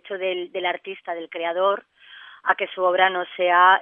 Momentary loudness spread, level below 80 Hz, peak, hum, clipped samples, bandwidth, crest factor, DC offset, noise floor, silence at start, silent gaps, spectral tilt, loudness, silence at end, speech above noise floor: 13 LU; -82 dBFS; -2 dBFS; none; under 0.1%; 3.8 kHz; 20 dB; under 0.1%; -46 dBFS; 0.05 s; none; -6.5 dB/octave; -22 LUFS; 0 s; 24 dB